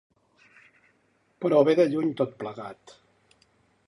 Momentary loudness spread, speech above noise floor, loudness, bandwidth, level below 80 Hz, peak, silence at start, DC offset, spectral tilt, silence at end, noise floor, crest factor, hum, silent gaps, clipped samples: 18 LU; 43 dB; -24 LUFS; 11.5 kHz; -76 dBFS; -6 dBFS; 1.4 s; under 0.1%; -7.5 dB/octave; 1.15 s; -67 dBFS; 22 dB; none; none; under 0.1%